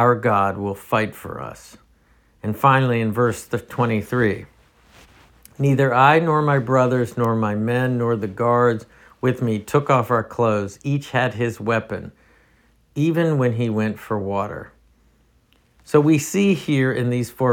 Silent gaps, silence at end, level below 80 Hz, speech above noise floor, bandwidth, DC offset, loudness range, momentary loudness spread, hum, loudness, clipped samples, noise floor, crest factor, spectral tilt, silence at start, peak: none; 0 s; -56 dBFS; 39 dB; 18 kHz; under 0.1%; 5 LU; 11 LU; none; -20 LUFS; under 0.1%; -59 dBFS; 20 dB; -7 dB/octave; 0 s; -2 dBFS